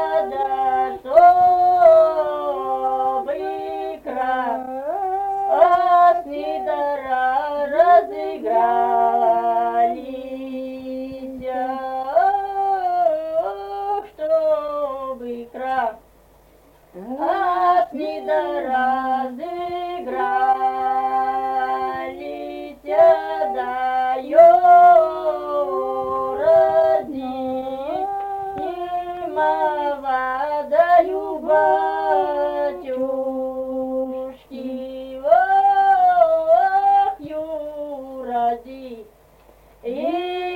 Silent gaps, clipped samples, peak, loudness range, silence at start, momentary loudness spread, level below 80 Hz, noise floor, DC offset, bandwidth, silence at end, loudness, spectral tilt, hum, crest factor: none; under 0.1%; -2 dBFS; 8 LU; 0 s; 15 LU; -56 dBFS; -51 dBFS; under 0.1%; 4.9 kHz; 0 s; -19 LUFS; -5.5 dB/octave; none; 18 dB